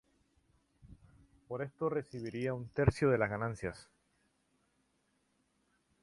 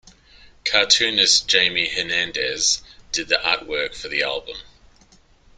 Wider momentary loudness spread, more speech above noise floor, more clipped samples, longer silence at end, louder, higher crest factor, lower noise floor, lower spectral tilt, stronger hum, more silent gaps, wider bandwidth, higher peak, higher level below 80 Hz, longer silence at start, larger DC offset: about the same, 13 LU vs 13 LU; first, 43 dB vs 33 dB; neither; first, 2.2 s vs 0.9 s; second, -36 LUFS vs -19 LUFS; about the same, 24 dB vs 22 dB; first, -77 dBFS vs -54 dBFS; first, -7.5 dB/octave vs 0.5 dB/octave; neither; neither; second, 11.5 kHz vs 13 kHz; second, -14 dBFS vs 0 dBFS; about the same, -54 dBFS vs -52 dBFS; first, 0.85 s vs 0.65 s; neither